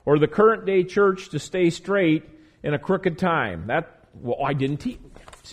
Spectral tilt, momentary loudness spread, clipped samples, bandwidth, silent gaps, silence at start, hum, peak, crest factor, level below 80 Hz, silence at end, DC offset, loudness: -6.5 dB/octave; 12 LU; under 0.1%; 10.5 kHz; none; 0.05 s; none; -6 dBFS; 18 dB; -52 dBFS; 0 s; under 0.1%; -23 LUFS